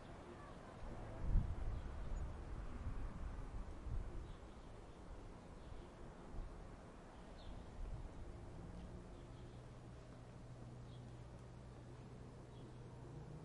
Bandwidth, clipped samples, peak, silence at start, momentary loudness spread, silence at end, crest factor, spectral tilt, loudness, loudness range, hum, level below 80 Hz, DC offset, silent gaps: 11 kHz; under 0.1%; -24 dBFS; 0 s; 8 LU; 0 s; 24 dB; -7 dB/octave; -53 LUFS; 8 LU; none; -50 dBFS; under 0.1%; none